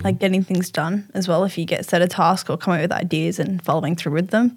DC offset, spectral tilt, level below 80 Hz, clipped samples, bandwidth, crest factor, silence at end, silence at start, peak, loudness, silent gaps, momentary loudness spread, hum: under 0.1%; -6 dB/octave; -66 dBFS; under 0.1%; 16.5 kHz; 16 dB; 0 s; 0 s; -4 dBFS; -21 LUFS; none; 5 LU; none